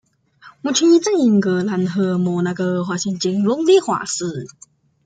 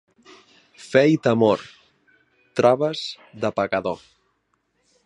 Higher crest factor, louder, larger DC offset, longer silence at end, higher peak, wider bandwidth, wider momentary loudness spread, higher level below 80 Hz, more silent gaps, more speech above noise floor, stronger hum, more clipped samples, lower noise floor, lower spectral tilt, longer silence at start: second, 14 dB vs 22 dB; first, -18 LUFS vs -21 LUFS; neither; second, 0.6 s vs 1.1 s; about the same, -4 dBFS vs -2 dBFS; second, 9.4 kHz vs 11 kHz; second, 10 LU vs 13 LU; about the same, -64 dBFS vs -62 dBFS; neither; second, 30 dB vs 50 dB; neither; neither; second, -48 dBFS vs -70 dBFS; about the same, -5 dB/octave vs -6 dB/octave; second, 0.45 s vs 0.8 s